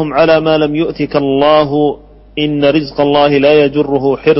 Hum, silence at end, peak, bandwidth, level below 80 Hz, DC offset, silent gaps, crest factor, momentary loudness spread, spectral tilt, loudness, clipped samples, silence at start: none; 0 s; 0 dBFS; 5.8 kHz; -40 dBFS; under 0.1%; none; 10 dB; 7 LU; -9.5 dB/octave; -11 LUFS; under 0.1%; 0 s